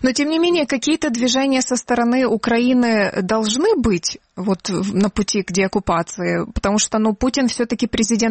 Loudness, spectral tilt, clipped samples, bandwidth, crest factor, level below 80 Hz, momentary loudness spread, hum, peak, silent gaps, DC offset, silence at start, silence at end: -18 LUFS; -4 dB/octave; under 0.1%; 8.8 kHz; 14 dB; -40 dBFS; 5 LU; none; -4 dBFS; none; under 0.1%; 0 s; 0 s